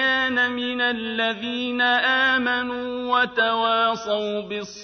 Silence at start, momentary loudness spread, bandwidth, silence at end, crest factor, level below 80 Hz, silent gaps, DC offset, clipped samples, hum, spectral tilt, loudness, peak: 0 s; 9 LU; 6.6 kHz; 0 s; 14 dB; -62 dBFS; none; under 0.1%; under 0.1%; none; -3.5 dB/octave; -21 LUFS; -8 dBFS